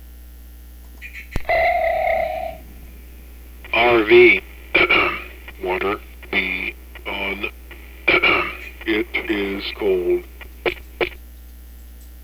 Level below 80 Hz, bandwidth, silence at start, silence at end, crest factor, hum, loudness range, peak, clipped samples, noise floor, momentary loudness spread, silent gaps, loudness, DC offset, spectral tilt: -38 dBFS; 15.5 kHz; 0 s; 0 s; 20 dB; 60 Hz at -40 dBFS; 7 LU; 0 dBFS; under 0.1%; -39 dBFS; 18 LU; none; -19 LUFS; under 0.1%; -5.5 dB/octave